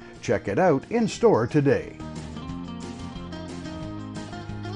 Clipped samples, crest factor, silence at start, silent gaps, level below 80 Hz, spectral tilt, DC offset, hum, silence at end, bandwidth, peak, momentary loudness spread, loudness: under 0.1%; 18 dB; 0 s; none; -48 dBFS; -6.5 dB/octave; under 0.1%; none; 0 s; 11 kHz; -8 dBFS; 15 LU; -26 LUFS